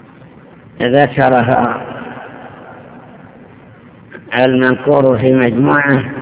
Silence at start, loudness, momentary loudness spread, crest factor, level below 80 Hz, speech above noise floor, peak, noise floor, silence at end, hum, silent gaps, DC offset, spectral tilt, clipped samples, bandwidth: 0.75 s; -12 LUFS; 21 LU; 14 dB; -48 dBFS; 28 dB; 0 dBFS; -39 dBFS; 0 s; none; none; under 0.1%; -10.5 dB/octave; 0.4%; 4 kHz